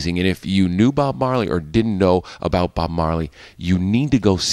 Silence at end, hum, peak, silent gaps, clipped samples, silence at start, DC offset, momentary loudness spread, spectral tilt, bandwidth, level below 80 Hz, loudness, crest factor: 0 s; none; -2 dBFS; none; under 0.1%; 0 s; under 0.1%; 5 LU; -6 dB/octave; 13 kHz; -36 dBFS; -19 LUFS; 16 dB